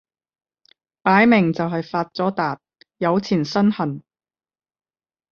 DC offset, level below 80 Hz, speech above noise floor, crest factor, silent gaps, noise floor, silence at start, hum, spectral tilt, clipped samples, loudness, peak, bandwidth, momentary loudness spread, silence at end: under 0.1%; -62 dBFS; over 71 dB; 20 dB; none; under -90 dBFS; 1.05 s; none; -7 dB/octave; under 0.1%; -20 LUFS; -2 dBFS; 6.8 kHz; 11 LU; 1.3 s